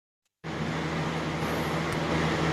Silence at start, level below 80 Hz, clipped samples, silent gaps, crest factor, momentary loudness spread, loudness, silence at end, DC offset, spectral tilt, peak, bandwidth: 0.45 s; -50 dBFS; under 0.1%; none; 14 dB; 7 LU; -30 LUFS; 0 s; under 0.1%; -5.5 dB/octave; -16 dBFS; 13.5 kHz